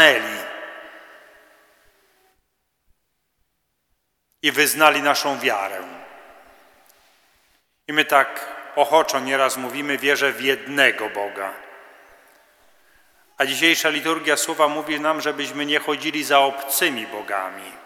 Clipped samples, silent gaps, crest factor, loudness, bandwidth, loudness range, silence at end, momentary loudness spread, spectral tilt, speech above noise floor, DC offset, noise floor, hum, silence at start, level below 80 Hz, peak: under 0.1%; none; 22 dB; -20 LUFS; over 20 kHz; 5 LU; 0 s; 16 LU; -1.5 dB/octave; 52 dB; under 0.1%; -73 dBFS; none; 0 s; -74 dBFS; 0 dBFS